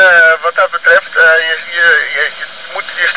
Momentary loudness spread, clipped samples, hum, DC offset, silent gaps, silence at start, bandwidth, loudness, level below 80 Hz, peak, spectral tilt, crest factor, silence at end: 14 LU; under 0.1%; none; 1%; none; 0 s; 4 kHz; -9 LUFS; -60 dBFS; 0 dBFS; -3.5 dB/octave; 10 dB; 0 s